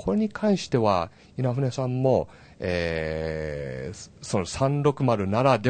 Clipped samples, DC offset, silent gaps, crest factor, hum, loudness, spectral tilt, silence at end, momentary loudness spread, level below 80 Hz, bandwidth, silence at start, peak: under 0.1%; under 0.1%; none; 20 dB; none; -26 LUFS; -6.5 dB/octave; 0 s; 11 LU; -48 dBFS; 9.2 kHz; 0 s; -6 dBFS